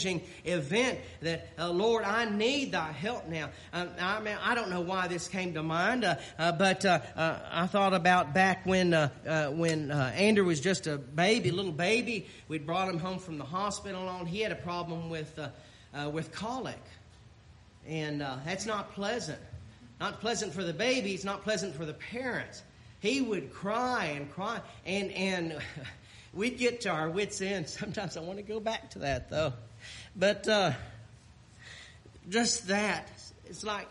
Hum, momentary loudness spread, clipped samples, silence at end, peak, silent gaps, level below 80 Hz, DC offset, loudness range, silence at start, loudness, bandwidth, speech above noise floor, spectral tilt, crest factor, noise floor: none; 14 LU; under 0.1%; 0 s; -14 dBFS; none; -60 dBFS; under 0.1%; 10 LU; 0 s; -31 LUFS; 11.5 kHz; 25 dB; -4.5 dB/octave; 20 dB; -56 dBFS